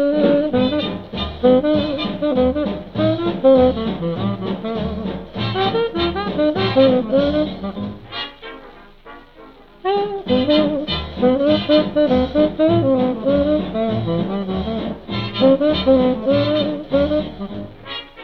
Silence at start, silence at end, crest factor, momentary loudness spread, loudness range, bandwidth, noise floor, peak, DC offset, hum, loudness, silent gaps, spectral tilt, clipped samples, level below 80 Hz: 0 s; 0 s; 16 dB; 12 LU; 4 LU; 6 kHz; -43 dBFS; -2 dBFS; under 0.1%; none; -18 LUFS; none; -8.5 dB/octave; under 0.1%; -38 dBFS